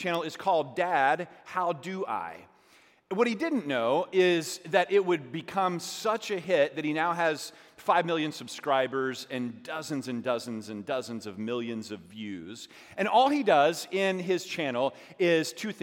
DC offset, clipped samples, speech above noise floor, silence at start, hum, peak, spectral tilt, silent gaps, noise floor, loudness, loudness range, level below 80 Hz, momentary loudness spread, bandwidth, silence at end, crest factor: under 0.1%; under 0.1%; 32 dB; 0 s; none; -8 dBFS; -4.5 dB/octave; none; -61 dBFS; -29 LUFS; 6 LU; -80 dBFS; 13 LU; 16.5 kHz; 0 s; 20 dB